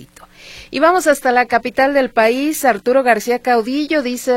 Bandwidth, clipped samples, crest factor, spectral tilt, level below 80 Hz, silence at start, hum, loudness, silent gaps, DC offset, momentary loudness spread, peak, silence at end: 16.5 kHz; under 0.1%; 16 dB; -3 dB/octave; -50 dBFS; 0 s; none; -15 LUFS; none; under 0.1%; 4 LU; 0 dBFS; 0 s